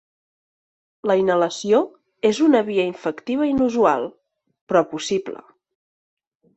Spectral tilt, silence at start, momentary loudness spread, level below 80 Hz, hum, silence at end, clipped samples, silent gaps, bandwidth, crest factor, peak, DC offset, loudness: -5 dB/octave; 1.05 s; 11 LU; -60 dBFS; none; 1.2 s; under 0.1%; 4.61-4.67 s; 8.4 kHz; 18 dB; -4 dBFS; under 0.1%; -20 LUFS